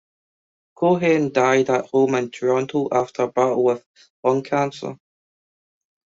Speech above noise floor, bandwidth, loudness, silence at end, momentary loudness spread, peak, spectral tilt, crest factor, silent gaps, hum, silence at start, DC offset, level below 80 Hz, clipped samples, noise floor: over 70 dB; 7.8 kHz; -20 LUFS; 1.15 s; 7 LU; -4 dBFS; -6 dB/octave; 18 dB; 3.86-3.94 s, 4.10-4.23 s; none; 0.8 s; under 0.1%; -66 dBFS; under 0.1%; under -90 dBFS